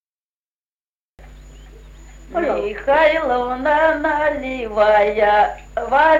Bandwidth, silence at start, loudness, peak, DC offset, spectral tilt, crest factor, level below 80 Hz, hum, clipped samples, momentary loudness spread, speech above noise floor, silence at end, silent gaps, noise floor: 7.4 kHz; 1.2 s; -17 LUFS; -2 dBFS; under 0.1%; -5 dB/octave; 16 dB; -42 dBFS; none; under 0.1%; 9 LU; over 74 dB; 0 s; none; under -90 dBFS